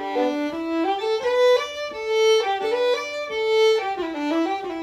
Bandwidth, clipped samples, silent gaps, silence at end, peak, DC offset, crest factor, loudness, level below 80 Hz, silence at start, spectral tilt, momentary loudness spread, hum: 13 kHz; under 0.1%; none; 0 s; -8 dBFS; under 0.1%; 14 dB; -22 LUFS; -62 dBFS; 0 s; -2.5 dB/octave; 8 LU; none